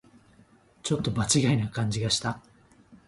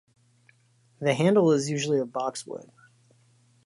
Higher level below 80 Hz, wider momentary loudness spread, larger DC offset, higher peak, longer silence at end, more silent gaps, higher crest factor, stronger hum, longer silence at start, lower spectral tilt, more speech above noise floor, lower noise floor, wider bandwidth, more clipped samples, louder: first, -54 dBFS vs -76 dBFS; second, 12 LU vs 17 LU; neither; about the same, -10 dBFS vs -8 dBFS; second, 0.15 s vs 1.05 s; neither; about the same, 20 dB vs 20 dB; neither; second, 0.85 s vs 1 s; about the same, -4.5 dB/octave vs -5.5 dB/octave; second, 33 dB vs 39 dB; second, -59 dBFS vs -64 dBFS; about the same, 11.5 kHz vs 11.5 kHz; neither; about the same, -27 LUFS vs -25 LUFS